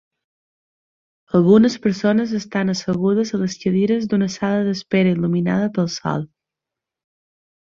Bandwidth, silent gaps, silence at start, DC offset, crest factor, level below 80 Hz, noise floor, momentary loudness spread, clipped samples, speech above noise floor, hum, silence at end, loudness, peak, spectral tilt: 7.4 kHz; none; 1.35 s; under 0.1%; 18 dB; -58 dBFS; -86 dBFS; 8 LU; under 0.1%; 68 dB; none; 1.5 s; -19 LUFS; -2 dBFS; -6.5 dB/octave